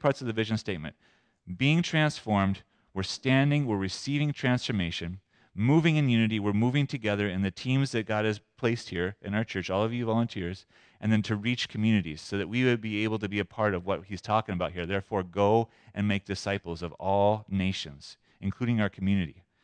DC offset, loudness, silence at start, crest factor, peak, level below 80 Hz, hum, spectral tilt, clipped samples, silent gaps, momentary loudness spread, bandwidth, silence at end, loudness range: under 0.1%; -29 LUFS; 0 s; 18 dB; -10 dBFS; -58 dBFS; none; -6.5 dB/octave; under 0.1%; none; 11 LU; 10 kHz; 0.3 s; 3 LU